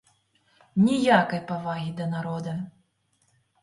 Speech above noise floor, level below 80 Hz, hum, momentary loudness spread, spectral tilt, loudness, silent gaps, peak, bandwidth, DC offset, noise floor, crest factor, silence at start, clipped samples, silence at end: 45 dB; -66 dBFS; none; 13 LU; -6.5 dB/octave; -25 LUFS; none; -4 dBFS; 11.5 kHz; under 0.1%; -70 dBFS; 22 dB; 0.75 s; under 0.1%; 0.95 s